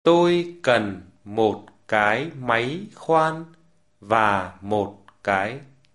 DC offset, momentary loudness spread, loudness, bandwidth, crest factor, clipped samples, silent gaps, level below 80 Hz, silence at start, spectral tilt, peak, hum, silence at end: 0.1%; 12 LU; -23 LUFS; 11.5 kHz; 20 dB; under 0.1%; none; -56 dBFS; 0.05 s; -6 dB/octave; -4 dBFS; none; 0.3 s